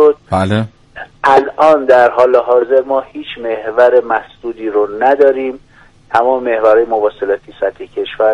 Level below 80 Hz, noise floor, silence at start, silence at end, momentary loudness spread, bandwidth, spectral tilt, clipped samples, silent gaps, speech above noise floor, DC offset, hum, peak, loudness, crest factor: -48 dBFS; -32 dBFS; 0 s; 0 s; 13 LU; 11 kHz; -7 dB/octave; under 0.1%; none; 20 dB; under 0.1%; none; 0 dBFS; -12 LUFS; 12 dB